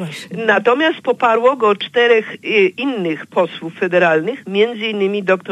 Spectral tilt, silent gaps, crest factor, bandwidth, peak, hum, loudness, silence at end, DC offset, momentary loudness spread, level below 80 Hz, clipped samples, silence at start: -5.5 dB/octave; none; 14 dB; 11.5 kHz; -2 dBFS; none; -16 LUFS; 0 s; under 0.1%; 7 LU; -72 dBFS; under 0.1%; 0 s